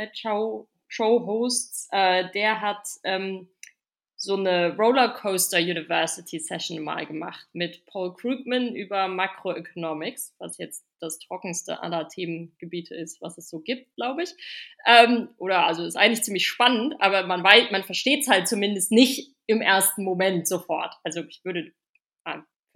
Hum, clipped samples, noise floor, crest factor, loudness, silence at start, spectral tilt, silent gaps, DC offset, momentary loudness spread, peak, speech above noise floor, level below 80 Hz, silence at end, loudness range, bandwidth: none; under 0.1%; -67 dBFS; 24 dB; -23 LUFS; 0 s; -2.5 dB/octave; 22.21-22.25 s; under 0.1%; 17 LU; 0 dBFS; 42 dB; -86 dBFS; 0.35 s; 13 LU; 17.5 kHz